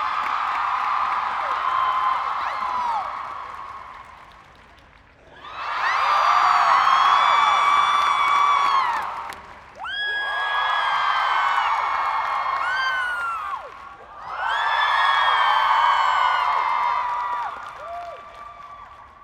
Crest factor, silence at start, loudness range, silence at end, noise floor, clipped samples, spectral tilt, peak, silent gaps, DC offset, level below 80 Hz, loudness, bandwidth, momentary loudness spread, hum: 18 dB; 0 s; 8 LU; 0.15 s; -50 dBFS; under 0.1%; -0.5 dB/octave; -4 dBFS; none; under 0.1%; -58 dBFS; -20 LUFS; 14 kHz; 20 LU; none